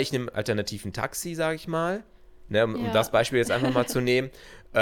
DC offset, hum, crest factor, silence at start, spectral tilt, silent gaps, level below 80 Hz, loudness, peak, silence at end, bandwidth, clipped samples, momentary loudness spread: under 0.1%; none; 20 dB; 0 s; -5 dB/octave; none; -52 dBFS; -26 LUFS; -8 dBFS; 0 s; 19 kHz; under 0.1%; 8 LU